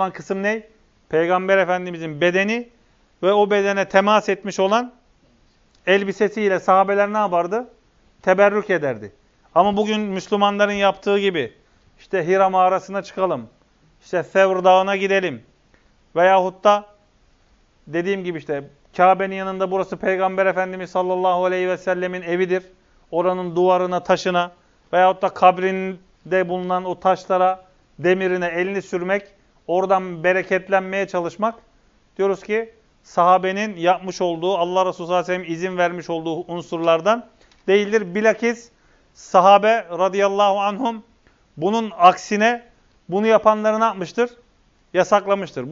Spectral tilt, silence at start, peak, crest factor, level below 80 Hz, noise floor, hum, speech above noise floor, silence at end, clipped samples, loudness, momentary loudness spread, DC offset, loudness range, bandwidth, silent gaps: -5.5 dB/octave; 0 s; 0 dBFS; 20 dB; -60 dBFS; -58 dBFS; none; 39 dB; 0 s; under 0.1%; -19 LUFS; 10 LU; under 0.1%; 3 LU; 7.6 kHz; none